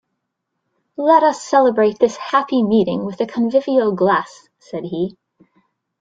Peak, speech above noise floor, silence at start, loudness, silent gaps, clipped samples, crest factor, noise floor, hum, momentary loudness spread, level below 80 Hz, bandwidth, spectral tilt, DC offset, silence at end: -2 dBFS; 59 dB; 1 s; -17 LUFS; none; under 0.1%; 16 dB; -76 dBFS; none; 13 LU; -62 dBFS; 9.2 kHz; -6 dB/octave; under 0.1%; 0.9 s